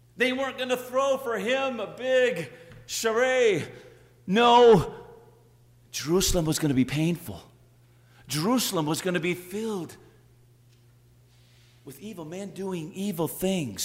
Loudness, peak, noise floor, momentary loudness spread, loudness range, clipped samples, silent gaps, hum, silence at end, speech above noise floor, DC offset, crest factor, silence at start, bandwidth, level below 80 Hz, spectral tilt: -25 LUFS; -8 dBFS; -57 dBFS; 16 LU; 14 LU; under 0.1%; none; 60 Hz at -55 dBFS; 0 s; 32 dB; under 0.1%; 18 dB; 0.15 s; 16 kHz; -48 dBFS; -4.5 dB/octave